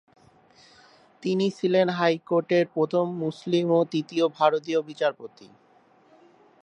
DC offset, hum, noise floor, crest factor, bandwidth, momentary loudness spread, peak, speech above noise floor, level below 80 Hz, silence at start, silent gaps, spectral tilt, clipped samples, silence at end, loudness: under 0.1%; none; -59 dBFS; 20 dB; 9 kHz; 6 LU; -6 dBFS; 35 dB; -78 dBFS; 1.25 s; none; -6.5 dB/octave; under 0.1%; 1.2 s; -25 LUFS